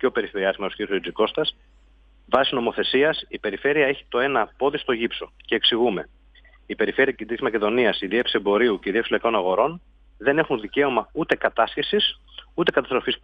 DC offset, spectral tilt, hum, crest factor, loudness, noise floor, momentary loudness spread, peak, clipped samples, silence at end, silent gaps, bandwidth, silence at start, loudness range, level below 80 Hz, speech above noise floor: under 0.1%; -6.5 dB/octave; none; 20 dB; -22 LUFS; -54 dBFS; 7 LU; -4 dBFS; under 0.1%; 0.05 s; none; 5.4 kHz; 0 s; 2 LU; -54 dBFS; 32 dB